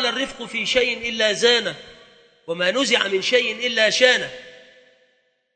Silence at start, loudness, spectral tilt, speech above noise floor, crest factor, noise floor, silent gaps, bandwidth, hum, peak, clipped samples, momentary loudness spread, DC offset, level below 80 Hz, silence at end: 0 s; -19 LUFS; -1.5 dB/octave; 45 dB; 22 dB; -65 dBFS; none; 9.2 kHz; none; 0 dBFS; under 0.1%; 14 LU; under 0.1%; -58 dBFS; 0.95 s